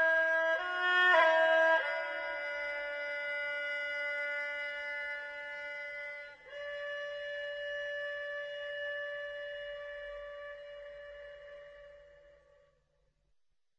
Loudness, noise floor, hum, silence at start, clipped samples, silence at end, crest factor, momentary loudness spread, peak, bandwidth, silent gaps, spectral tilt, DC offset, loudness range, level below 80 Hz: -33 LUFS; -79 dBFS; none; 0 s; under 0.1%; 1.45 s; 20 dB; 21 LU; -14 dBFS; 8.8 kHz; none; -1.5 dB/octave; under 0.1%; 18 LU; -72 dBFS